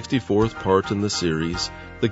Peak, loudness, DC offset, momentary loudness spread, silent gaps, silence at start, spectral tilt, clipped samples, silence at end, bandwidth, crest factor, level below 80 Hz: -4 dBFS; -23 LUFS; under 0.1%; 6 LU; none; 0 s; -5 dB/octave; under 0.1%; 0 s; 8 kHz; 18 dB; -44 dBFS